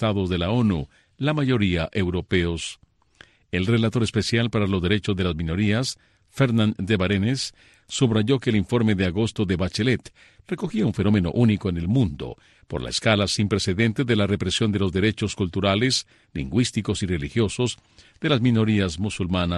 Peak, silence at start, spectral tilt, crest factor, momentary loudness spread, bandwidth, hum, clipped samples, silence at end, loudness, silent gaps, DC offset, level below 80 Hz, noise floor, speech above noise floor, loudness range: -4 dBFS; 0 s; -5.5 dB/octave; 18 dB; 9 LU; 12 kHz; none; under 0.1%; 0 s; -23 LUFS; none; under 0.1%; -44 dBFS; -54 dBFS; 31 dB; 2 LU